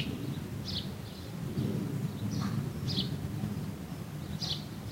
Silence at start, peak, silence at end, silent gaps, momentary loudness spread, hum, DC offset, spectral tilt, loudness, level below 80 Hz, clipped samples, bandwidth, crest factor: 0 s; -18 dBFS; 0 s; none; 7 LU; none; under 0.1%; -6 dB/octave; -36 LUFS; -54 dBFS; under 0.1%; 16 kHz; 18 dB